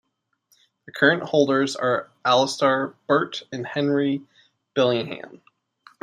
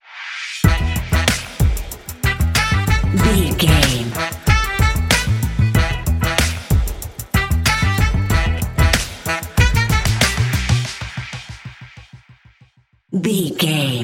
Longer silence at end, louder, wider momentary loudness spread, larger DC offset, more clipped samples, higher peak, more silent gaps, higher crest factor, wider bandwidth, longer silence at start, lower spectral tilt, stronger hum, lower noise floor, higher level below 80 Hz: first, 0.75 s vs 0 s; second, -22 LUFS vs -17 LUFS; about the same, 12 LU vs 11 LU; neither; neither; second, -4 dBFS vs 0 dBFS; neither; about the same, 20 dB vs 18 dB; second, 13 kHz vs 17 kHz; first, 0.95 s vs 0.1 s; about the same, -4.5 dB/octave vs -4.5 dB/octave; neither; first, -68 dBFS vs -54 dBFS; second, -72 dBFS vs -22 dBFS